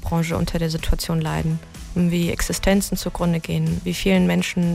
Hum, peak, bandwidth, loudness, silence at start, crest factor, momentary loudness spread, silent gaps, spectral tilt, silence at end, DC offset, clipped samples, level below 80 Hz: none; -4 dBFS; 16 kHz; -22 LUFS; 0 s; 16 dB; 6 LU; none; -5.5 dB/octave; 0 s; under 0.1%; under 0.1%; -32 dBFS